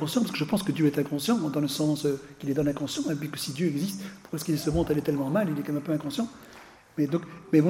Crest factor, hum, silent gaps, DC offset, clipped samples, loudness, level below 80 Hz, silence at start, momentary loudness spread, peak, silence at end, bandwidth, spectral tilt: 20 dB; none; none; under 0.1%; under 0.1%; -28 LUFS; -52 dBFS; 0 s; 8 LU; -8 dBFS; 0 s; 16.5 kHz; -6 dB/octave